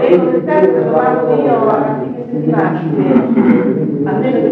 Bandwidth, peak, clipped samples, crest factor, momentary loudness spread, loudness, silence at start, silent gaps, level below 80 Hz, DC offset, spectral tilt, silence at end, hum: 4.8 kHz; 0 dBFS; under 0.1%; 12 dB; 5 LU; -13 LUFS; 0 s; none; -56 dBFS; under 0.1%; -10.5 dB/octave; 0 s; none